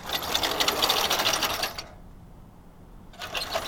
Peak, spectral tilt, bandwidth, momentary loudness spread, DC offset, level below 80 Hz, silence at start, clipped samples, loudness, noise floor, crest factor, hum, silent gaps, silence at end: -8 dBFS; -1 dB/octave; over 20 kHz; 16 LU; under 0.1%; -50 dBFS; 0 s; under 0.1%; -25 LUFS; -48 dBFS; 22 dB; none; none; 0 s